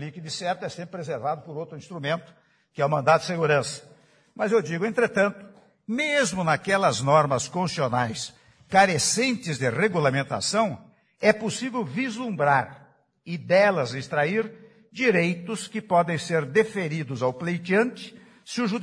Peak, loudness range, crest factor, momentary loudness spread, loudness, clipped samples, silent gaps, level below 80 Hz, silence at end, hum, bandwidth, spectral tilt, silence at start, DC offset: -4 dBFS; 3 LU; 20 dB; 14 LU; -24 LUFS; under 0.1%; none; -66 dBFS; 0 s; none; 10.5 kHz; -4.5 dB/octave; 0 s; under 0.1%